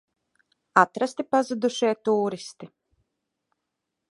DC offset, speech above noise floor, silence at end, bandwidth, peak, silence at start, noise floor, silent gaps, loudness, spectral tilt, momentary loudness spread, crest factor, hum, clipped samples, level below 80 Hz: under 0.1%; 59 dB; 1.45 s; 11.5 kHz; -2 dBFS; 0.75 s; -82 dBFS; none; -24 LUFS; -4.5 dB/octave; 9 LU; 24 dB; none; under 0.1%; -78 dBFS